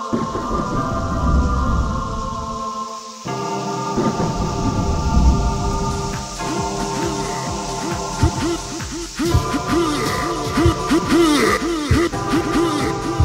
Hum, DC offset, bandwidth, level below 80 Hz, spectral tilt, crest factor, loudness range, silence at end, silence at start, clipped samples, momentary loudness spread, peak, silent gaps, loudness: none; under 0.1%; 16 kHz; -26 dBFS; -5.5 dB/octave; 16 dB; 5 LU; 0 s; 0 s; under 0.1%; 9 LU; -2 dBFS; none; -20 LUFS